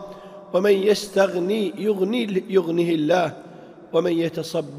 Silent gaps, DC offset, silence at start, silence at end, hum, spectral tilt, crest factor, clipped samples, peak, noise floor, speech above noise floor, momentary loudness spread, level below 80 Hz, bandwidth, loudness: none; under 0.1%; 0 s; 0 s; none; -5.5 dB/octave; 16 dB; under 0.1%; -6 dBFS; -43 dBFS; 22 dB; 8 LU; -66 dBFS; 15.5 kHz; -22 LUFS